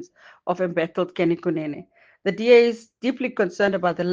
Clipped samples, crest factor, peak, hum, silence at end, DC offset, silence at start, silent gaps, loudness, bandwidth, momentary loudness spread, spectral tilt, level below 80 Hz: under 0.1%; 18 dB; -4 dBFS; none; 0 s; under 0.1%; 0 s; none; -22 LUFS; 7.4 kHz; 13 LU; -6.5 dB/octave; -68 dBFS